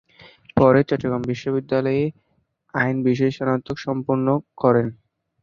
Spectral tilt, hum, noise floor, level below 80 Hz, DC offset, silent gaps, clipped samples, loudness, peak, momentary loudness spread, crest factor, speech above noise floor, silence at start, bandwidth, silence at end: -8.5 dB/octave; none; -66 dBFS; -52 dBFS; under 0.1%; none; under 0.1%; -21 LUFS; -2 dBFS; 9 LU; 20 dB; 45 dB; 0.55 s; 7 kHz; 0.5 s